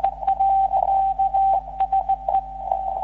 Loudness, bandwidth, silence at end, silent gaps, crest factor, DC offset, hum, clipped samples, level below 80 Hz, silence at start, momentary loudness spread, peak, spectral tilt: -21 LUFS; 4 kHz; 0 s; none; 14 dB; under 0.1%; none; under 0.1%; -42 dBFS; 0 s; 6 LU; -6 dBFS; -4.5 dB/octave